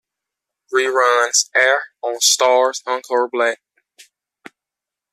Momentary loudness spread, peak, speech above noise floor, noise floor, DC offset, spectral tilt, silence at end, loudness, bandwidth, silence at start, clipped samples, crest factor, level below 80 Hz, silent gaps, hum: 8 LU; -2 dBFS; 69 dB; -86 dBFS; under 0.1%; 1.5 dB/octave; 1.55 s; -16 LUFS; 14.5 kHz; 0.7 s; under 0.1%; 18 dB; -76 dBFS; none; none